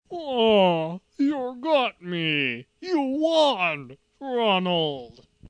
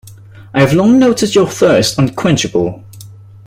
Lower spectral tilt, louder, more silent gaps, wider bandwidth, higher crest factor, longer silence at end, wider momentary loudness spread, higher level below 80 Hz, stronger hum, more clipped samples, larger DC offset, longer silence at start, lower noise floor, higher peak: about the same, -5.5 dB/octave vs -5.5 dB/octave; second, -23 LUFS vs -12 LUFS; neither; second, 10 kHz vs 16 kHz; about the same, 16 dB vs 12 dB; about the same, 0.4 s vs 0.3 s; about the same, 11 LU vs 9 LU; second, -64 dBFS vs -42 dBFS; neither; neither; neither; about the same, 0.1 s vs 0.05 s; first, -45 dBFS vs -35 dBFS; second, -8 dBFS vs 0 dBFS